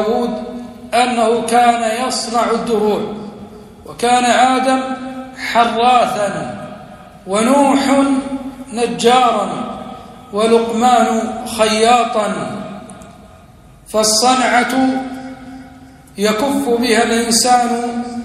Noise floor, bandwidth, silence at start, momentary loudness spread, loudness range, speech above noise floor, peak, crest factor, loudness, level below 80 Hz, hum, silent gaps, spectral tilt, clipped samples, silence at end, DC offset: -42 dBFS; 14.5 kHz; 0 s; 18 LU; 2 LU; 28 dB; 0 dBFS; 16 dB; -14 LUFS; -48 dBFS; none; none; -3 dB/octave; under 0.1%; 0 s; under 0.1%